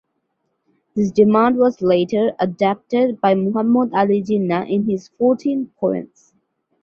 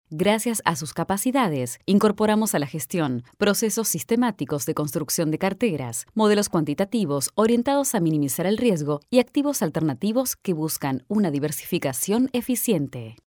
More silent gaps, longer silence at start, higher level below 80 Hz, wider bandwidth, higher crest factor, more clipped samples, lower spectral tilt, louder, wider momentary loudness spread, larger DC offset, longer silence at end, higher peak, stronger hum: neither; first, 0.95 s vs 0.1 s; about the same, -60 dBFS vs -60 dBFS; second, 7 kHz vs over 20 kHz; about the same, 16 dB vs 20 dB; neither; first, -8 dB/octave vs -5 dB/octave; first, -18 LUFS vs -23 LUFS; about the same, 8 LU vs 6 LU; neither; first, 0.75 s vs 0.25 s; about the same, -2 dBFS vs -4 dBFS; neither